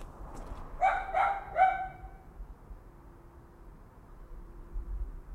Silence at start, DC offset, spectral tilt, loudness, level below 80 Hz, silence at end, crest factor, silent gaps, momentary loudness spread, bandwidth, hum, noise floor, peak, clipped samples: 0 s; under 0.1%; -5.5 dB/octave; -31 LUFS; -44 dBFS; 0 s; 22 dB; none; 26 LU; 10.5 kHz; none; -53 dBFS; -14 dBFS; under 0.1%